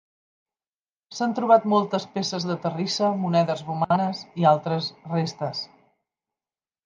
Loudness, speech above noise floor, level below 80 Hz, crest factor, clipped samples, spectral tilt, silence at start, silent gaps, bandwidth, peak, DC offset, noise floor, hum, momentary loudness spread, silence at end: -24 LUFS; over 67 dB; -72 dBFS; 22 dB; under 0.1%; -6 dB/octave; 1.1 s; none; 9.4 kHz; -4 dBFS; under 0.1%; under -90 dBFS; none; 10 LU; 1.2 s